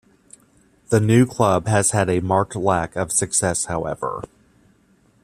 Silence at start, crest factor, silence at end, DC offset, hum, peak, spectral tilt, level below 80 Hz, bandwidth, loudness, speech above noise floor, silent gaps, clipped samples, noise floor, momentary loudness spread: 0.9 s; 20 dB; 1 s; under 0.1%; none; -2 dBFS; -5 dB/octave; -50 dBFS; 14.5 kHz; -19 LUFS; 39 dB; none; under 0.1%; -58 dBFS; 10 LU